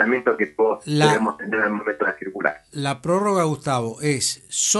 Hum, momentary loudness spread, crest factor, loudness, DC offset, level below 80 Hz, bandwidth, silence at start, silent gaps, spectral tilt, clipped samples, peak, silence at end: none; 7 LU; 18 dB; -22 LUFS; under 0.1%; -62 dBFS; 12 kHz; 0 s; none; -3.5 dB/octave; under 0.1%; -4 dBFS; 0 s